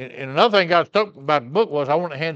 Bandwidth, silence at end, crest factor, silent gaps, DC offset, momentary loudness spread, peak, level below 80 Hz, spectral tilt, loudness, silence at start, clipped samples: 8 kHz; 0 s; 18 dB; none; under 0.1%; 6 LU; 0 dBFS; -74 dBFS; -6 dB/octave; -19 LUFS; 0 s; under 0.1%